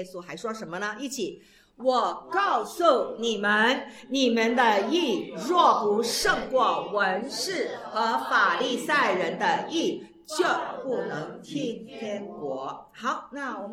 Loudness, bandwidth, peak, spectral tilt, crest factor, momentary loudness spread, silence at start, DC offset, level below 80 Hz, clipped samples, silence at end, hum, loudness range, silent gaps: -26 LUFS; 16 kHz; -6 dBFS; -3 dB/octave; 20 dB; 13 LU; 0 s; under 0.1%; -62 dBFS; under 0.1%; 0 s; none; 7 LU; none